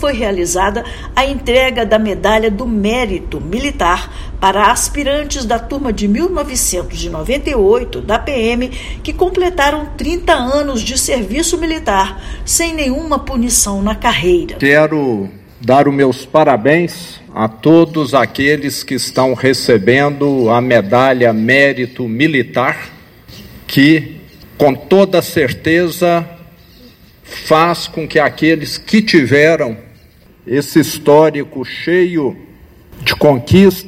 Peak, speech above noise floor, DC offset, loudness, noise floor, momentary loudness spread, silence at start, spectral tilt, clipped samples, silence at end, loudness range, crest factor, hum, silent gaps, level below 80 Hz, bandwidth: 0 dBFS; 31 dB; under 0.1%; -13 LUFS; -44 dBFS; 10 LU; 0 s; -4.5 dB/octave; 0.4%; 0 s; 3 LU; 14 dB; none; none; -30 dBFS; 16.5 kHz